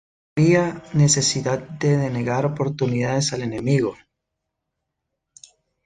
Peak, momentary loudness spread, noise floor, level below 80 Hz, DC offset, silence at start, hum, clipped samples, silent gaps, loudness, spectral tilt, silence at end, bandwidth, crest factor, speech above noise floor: -4 dBFS; 7 LU; -80 dBFS; -54 dBFS; under 0.1%; 0.35 s; none; under 0.1%; none; -21 LUFS; -5 dB/octave; 1.9 s; 9.6 kHz; 18 dB; 60 dB